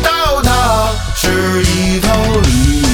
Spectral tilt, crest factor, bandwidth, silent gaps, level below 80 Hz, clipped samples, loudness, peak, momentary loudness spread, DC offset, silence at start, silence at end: -4.5 dB/octave; 12 dB; 19.5 kHz; none; -18 dBFS; under 0.1%; -12 LUFS; 0 dBFS; 3 LU; under 0.1%; 0 s; 0 s